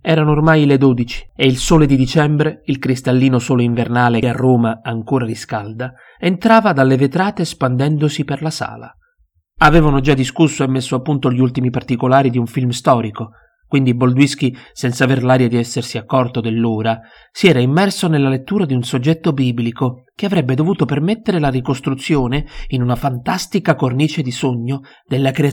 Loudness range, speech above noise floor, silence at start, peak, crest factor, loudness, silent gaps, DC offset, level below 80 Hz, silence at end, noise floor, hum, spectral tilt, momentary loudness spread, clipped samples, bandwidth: 3 LU; 45 dB; 0.05 s; 0 dBFS; 14 dB; -15 LUFS; none; under 0.1%; -34 dBFS; 0 s; -60 dBFS; none; -6.5 dB/octave; 10 LU; under 0.1%; 16 kHz